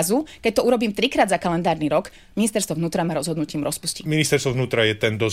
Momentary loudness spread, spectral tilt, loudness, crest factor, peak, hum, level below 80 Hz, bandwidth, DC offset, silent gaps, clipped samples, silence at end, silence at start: 6 LU; -4.5 dB/octave; -22 LUFS; 16 dB; -4 dBFS; none; -50 dBFS; 16 kHz; 0.2%; none; under 0.1%; 0 s; 0 s